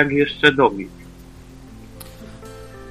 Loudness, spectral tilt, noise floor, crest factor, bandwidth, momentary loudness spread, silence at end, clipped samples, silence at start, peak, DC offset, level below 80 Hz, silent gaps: -16 LUFS; -5.5 dB/octave; -41 dBFS; 22 dB; 15 kHz; 25 LU; 0 s; under 0.1%; 0 s; 0 dBFS; under 0.1%; -44 dBFS; none